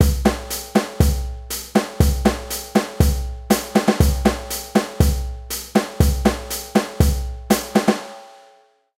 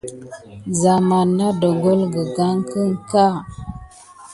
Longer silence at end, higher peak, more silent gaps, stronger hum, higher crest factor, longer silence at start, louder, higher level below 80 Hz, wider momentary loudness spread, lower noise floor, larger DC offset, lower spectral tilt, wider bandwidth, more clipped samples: first, 0.7 s vs 0 s; about the same, -2 dBFS vs -2 dBFS; neither; neither; about the same, 18 dB vs 16 dB; about the same, 0 s vs 0.05 s; about the same, -20 LUFS vs -18 LUFS; first, -24 dBFS vs -48 dBFS; second, 10 LU vs 19 LU; first, -54 dBFS vs -42 dBFS; neither; about the same, -5.5 dB/octave vs -6.5 dB/octave; first, 16.5 kHz vs 11.5 kHz; neither